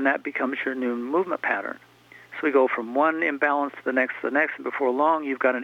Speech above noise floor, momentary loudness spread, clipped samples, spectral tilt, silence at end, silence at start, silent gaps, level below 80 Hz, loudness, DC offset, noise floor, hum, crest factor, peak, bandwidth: 20 dB; 6 LU; under 0.1%; -6 dB/octave; 0 s; 0 s; none; -78 dBFS; -24 LUFS; under 0.1%; -44 dBFS; none; 16 dB; -8 dBFS; 7.4 kHz